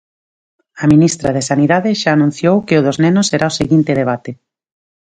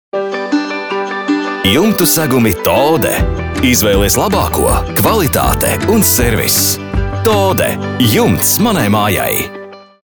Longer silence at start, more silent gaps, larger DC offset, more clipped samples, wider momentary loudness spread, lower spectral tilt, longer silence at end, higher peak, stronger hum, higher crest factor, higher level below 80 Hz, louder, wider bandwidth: first, 0.75 s vs 0.15 s; neither; neither; neither; about the same, 6 LU vs 7 LU; first, -5.5 dB/octave vs -4 dB/octave; first, 0.8 s vs 0.2 s; about the same, 0 dBFS vs 0 dBFS; neither; about the same, 14 dB vs 12 dB; second, -46 dBFS vs -26 dBFS; about the same, -13 LUFS vs -12 LUFS; second, 9.4 kHz vs over 20 kHz